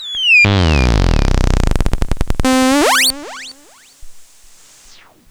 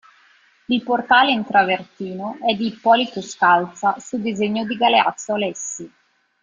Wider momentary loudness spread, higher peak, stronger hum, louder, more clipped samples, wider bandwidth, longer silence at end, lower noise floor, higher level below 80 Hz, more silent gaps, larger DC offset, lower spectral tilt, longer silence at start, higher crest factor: first, 16 LU vs 12 LU; about the same, 0 dBFS vs -2 dBFS; neither; first, -13 LUFS vs -19 LUFS; neither; first, over 20 kHz vs 9.6 kHz; first, 1.05 s vs 0.55 s; second, -44 dBFS vs -55 dBFS; first, -20 dBFS vs -64 dBFS; neither; neither; about the same, -4 dB/octave vs -3.5 dB/octave; second, 0 s vs 0.7 s; about the same, 14 dB vs 18 dB